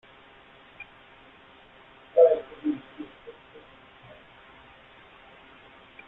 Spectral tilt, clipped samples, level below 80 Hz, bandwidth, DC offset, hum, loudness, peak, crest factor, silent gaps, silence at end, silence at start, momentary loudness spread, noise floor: -8 dB/octave; under 0.1%; -68 dBFS; 4 kHz; under 0.1%; none; -24 LUFS; -6 dBFS; 24 dB; none; 2.75 s; 0.8 s; 30 LU; -53 dBFS